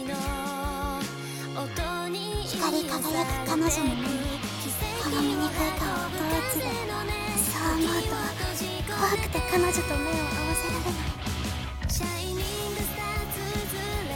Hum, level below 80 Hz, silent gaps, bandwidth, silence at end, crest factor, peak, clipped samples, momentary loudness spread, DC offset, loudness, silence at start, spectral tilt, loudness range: none; -38 dBFS; none; 18 kHz; 0 s; 18 dB; -10 dBFS; under 0.1%; 6 LU; under 0.1%; -28 LUFS; 0 s; -4 dB/octave; 3 LU